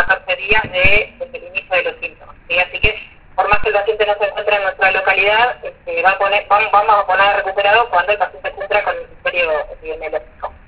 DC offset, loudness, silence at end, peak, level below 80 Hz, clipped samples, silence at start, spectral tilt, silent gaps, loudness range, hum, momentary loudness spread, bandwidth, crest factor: under 0.1%; -15 LUFS; 0.2 s; 0 dBFS; -36 dBFS; under 0.1%; 0 s; -7 dB/octave; none; 4 LU; none; 13 LU; 4 kHz; 16 dB